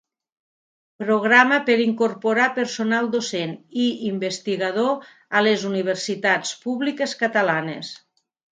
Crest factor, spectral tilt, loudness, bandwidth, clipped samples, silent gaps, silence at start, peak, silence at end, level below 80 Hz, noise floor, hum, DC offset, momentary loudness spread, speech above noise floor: 22 dB; -4 dB/octave; -21 LUFS; 9.4 kHz; under 0.1%; none; 1 s; 0 dBFS; 0.55 s; -74 dBFS; under -90 dBFS; none; under 0.1%; 11 LU; over 69 dB